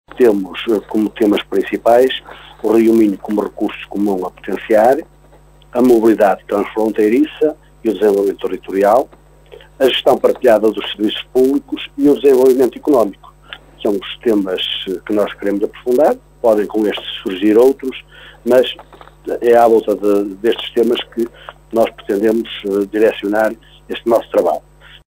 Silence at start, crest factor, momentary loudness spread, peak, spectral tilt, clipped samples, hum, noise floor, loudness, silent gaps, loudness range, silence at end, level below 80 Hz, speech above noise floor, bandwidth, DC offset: 0.15 s; 14 dB; 12 LU; 0 dBFS; -5.5 dB/octave; under 0.1%; none; -45 dBFS; -15 LUFS; none; 3 LU; 0.5 s; -48 dBFS; 30 dB; 16.5 kHz; under 0.1%